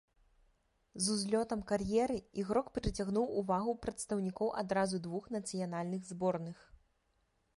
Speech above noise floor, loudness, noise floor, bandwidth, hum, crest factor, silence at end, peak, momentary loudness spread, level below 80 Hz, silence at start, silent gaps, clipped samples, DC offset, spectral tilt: 42 dB; -36 LUFS; -77 dBFS; 11.5 kHz; none; 20 dB; 1.05 s; -18 dBFS; 7 LU; -56 dBFS; 0.95 s; none; under 0.1%; under 0.1%; -5 dB/octave